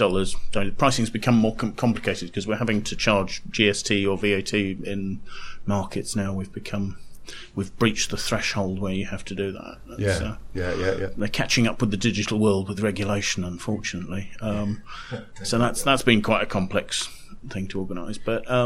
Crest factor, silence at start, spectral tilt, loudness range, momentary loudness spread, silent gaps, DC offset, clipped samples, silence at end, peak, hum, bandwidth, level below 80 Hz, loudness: 20 dB; 0 s; -4.5 dB/octave; 4 LU; 13 LU; none; under 0.1%; under 0.1%; 0 s; -4 dBFS; none; 15.5 kHz; -40 dBFS; -25 LUFS